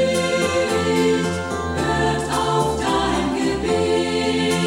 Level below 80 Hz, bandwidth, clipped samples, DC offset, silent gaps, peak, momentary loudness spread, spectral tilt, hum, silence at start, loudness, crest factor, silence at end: -38 dBFS; 16 kHz; under 0.1%; 0.1%; none; -6 dBFS; 3 LU; -4.5 dB/octave; none; 0 s; -20 LUFS; 14 dB; 0 s